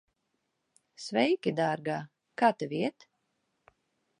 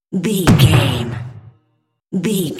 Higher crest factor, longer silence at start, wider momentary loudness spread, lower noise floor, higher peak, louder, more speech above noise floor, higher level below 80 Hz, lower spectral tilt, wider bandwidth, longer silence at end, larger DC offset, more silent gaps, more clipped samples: first, 22 dB vs 16 dB; first, 1 s vs 0.1 s; second, 11 LU vs 16 LU; first, -80 dBFS vs -65 dBFS; second, -10 dBFS vs 0 dBFS; second, -30 LUFS vs -15 LUFS; about the same, 51 dB vs 51 dB; second, -82 dBFS vs -36 dBFS; about the same, -5.5 dB/octave vs -5.5 dB/octave; second, 11 kHz vs 16.5 kHz; first, 1.3 s vs 0 s; neither; neither; neither